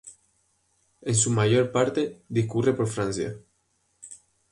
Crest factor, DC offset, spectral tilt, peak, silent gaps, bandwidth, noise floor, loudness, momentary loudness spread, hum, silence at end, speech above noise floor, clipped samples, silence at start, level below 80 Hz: 20 dB; under 0.1%; -5 dB/octave; -8 dBFS; none; 11.5 kHz; -71 dBFS; -25 LUFS; 23 LU; none; 0.35 s; 47 dB; under 0.1%; 0.05 s; -58 dBFS